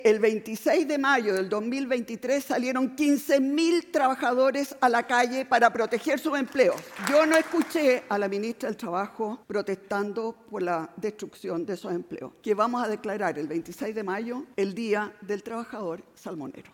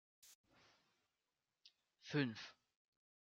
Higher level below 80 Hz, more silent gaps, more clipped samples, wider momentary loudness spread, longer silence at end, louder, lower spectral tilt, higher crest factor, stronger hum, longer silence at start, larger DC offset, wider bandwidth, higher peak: first, -72 dBFS vs under -90 dBFS; second, none vs 0.35-0.44 s; neither; second, 11 LU vs 25 LU; second, 0.1 s vs 0.8 s; first, -26 LUFS vs -44 LUFS; second, -4.5 dB/octave vs -6 dB/octave; about the same, 20 dB vs 24 dB; neither; second, 0 s vs 0.25 s; neither; first, 17 kHz vs 11.5 kHz; first, -6 dBFS vs -28 dBFS